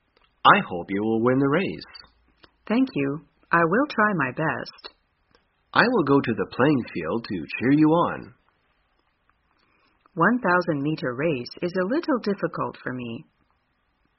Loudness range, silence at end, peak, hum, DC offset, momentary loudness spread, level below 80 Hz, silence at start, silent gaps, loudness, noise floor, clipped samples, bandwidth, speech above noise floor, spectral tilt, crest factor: 4 LU; 0.95 s; 0 dBFS; none; under 0.1%; 13 LU; -60 dBFS; 0.45 s; none; -23 LUFS; -70 dBFS; under 0.1%; 5.8 kHz; 47 dB; -4.5 dB/octave; 24 dB